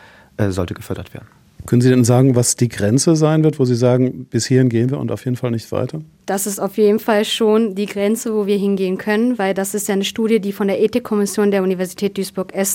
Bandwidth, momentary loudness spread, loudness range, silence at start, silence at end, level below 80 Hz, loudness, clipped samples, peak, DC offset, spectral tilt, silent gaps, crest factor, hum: 17 kHz; 10 LU; 3 LU; 0.4 s; 0 s; -52 dBFS; -17 LUFS; under 0.1%; 0 dBFS; under 0.1%; -5.5 dB/octave; none; 16 dB; none